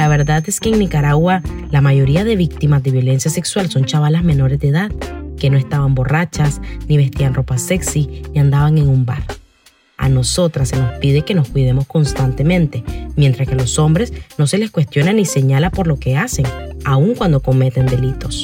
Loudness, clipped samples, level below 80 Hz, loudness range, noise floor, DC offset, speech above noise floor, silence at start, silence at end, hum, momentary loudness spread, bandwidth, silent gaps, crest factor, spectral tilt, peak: -15 LUFS; under 0.1%; -28 dBFS; 2 LU; -51 dBFS; under 0.1%; 37 dB; 0 s; 0 s; none; 6 LU; 16 kHz; none; 12 dB; -6 dB/octave; -2 dBFS